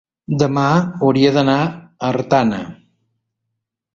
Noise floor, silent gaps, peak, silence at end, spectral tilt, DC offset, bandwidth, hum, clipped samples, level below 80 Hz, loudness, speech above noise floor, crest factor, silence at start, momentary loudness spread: -78 dBFS; none; -2 dBFS; 1.2 s; -7 dB/octave; under 0.1%; 7.4 kHz; none; under 0.1%; -54 dBFS; -16 LUFS; 62 dB; 16 dB; 0.3 s; 11 LU